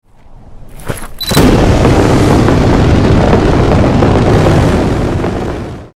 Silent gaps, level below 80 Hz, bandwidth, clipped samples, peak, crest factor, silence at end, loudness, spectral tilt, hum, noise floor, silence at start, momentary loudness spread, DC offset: none; -18 dBFS; 16.5 kHz; under 0.1%; 0 dBFS; 10 dB; 0.1 s; -9 LUFS; -6.5 dB/octave; none; -34 dBFS; 0.3 s; 11 LU; under 0.1%